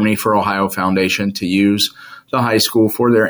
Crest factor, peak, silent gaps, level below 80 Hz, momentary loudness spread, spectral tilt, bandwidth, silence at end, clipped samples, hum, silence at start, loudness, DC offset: 12 dB; -2 dBFS; none; -54 dBFS; 5 LU; -4.5 dB/octave; over 20 kHz; 0 s; under 0.1%; none; 0 s; -15 LUFS; under 0.1%